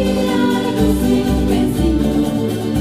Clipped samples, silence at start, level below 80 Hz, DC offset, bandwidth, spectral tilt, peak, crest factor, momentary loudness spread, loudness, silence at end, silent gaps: under 0.1%; 0 s; -26 dBFS; 0.5%; 15.5 kHz; -6.5 dB/octave; -4 dBFS; 12 dB; 2 LU; -16 LUFS; 0 s; none